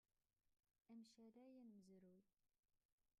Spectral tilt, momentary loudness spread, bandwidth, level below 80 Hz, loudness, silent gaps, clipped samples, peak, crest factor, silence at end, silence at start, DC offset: -6 dB/octave; 2 LU; 9 kHz; under -90 dBFS; -67 LUFS; 2.59-2.63 s, 2.85-2.98 s; under 0.1%; -56 dBFS; 14 dB; 0.1 s; 0.45 s; under 0.1%